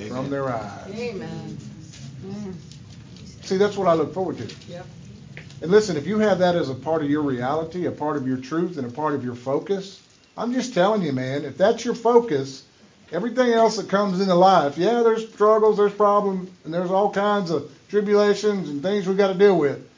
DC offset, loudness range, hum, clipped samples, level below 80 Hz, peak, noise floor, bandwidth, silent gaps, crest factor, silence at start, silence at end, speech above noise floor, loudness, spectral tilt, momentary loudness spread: under 0.1%; 7 LU; none; under 0.1%; -58 dBFS; -2 dBFS; -41 dBFS; 7.6 kHz; none; 20 dB; 0 s; 0.15 s; 20 dB; -21 LUFS; -6 dB/octave; 21 LU